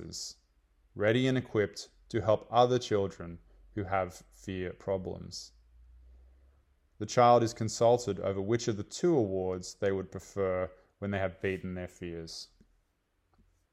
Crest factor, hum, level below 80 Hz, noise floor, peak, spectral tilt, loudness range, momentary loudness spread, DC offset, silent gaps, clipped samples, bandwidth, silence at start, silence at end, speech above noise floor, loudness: 22 dB; none; -62 dBFS; -76 dBFS; -10 dBFS; -5.5 dB/octave; 10 LU; 17 LU; under 0.1%; none; under 0.1%; 13.5 kHz; 0 s; 1.25 s; 45 dB; -31 LUFS